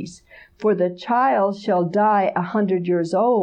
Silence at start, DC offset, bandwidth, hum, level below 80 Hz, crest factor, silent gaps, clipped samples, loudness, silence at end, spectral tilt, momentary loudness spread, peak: 0 s; under 0.1%; 9.6 kHz; none; -64 dBFS; 12 dB; none; under 0.1%; -20 LUFS; 0 s; -7.5 dB/octave; 4 LU; -8 dBFS